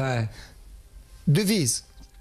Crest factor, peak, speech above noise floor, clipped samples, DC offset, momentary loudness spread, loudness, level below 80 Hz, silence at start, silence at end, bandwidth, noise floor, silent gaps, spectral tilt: 14 dB; -12 dBFS; 23 dB; under 0.1%; under 0.1%; 12 LU; -25 LUFS; -48 dBFS; 0 s; 0 s; 14.5 kHz; -47 dBFS; none; -4.5 dB/octave